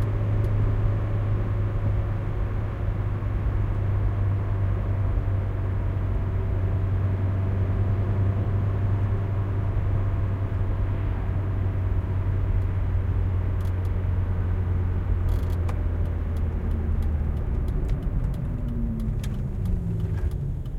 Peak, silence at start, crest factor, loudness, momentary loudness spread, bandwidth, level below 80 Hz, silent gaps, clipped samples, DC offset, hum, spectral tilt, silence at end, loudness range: -10 dBFS; 0 s; 14 dB; -27 LUFS; 4 LU; 4 kHz; -28 dBFS; none; under 0.1%; under 0.1%; none; -9.5 dB/octave; 0 s; 3 LU